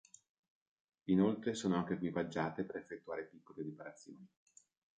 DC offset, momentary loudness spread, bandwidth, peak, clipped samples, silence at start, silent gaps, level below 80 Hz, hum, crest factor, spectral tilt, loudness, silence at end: under 0.1%; 19 LU; 9 kHz; -20 dBFS; under 0.1%; 1.05 s; none; -72 dBFS; none; 20 dB; -6.5 dB/octave; -38 LUFS; 0.75 s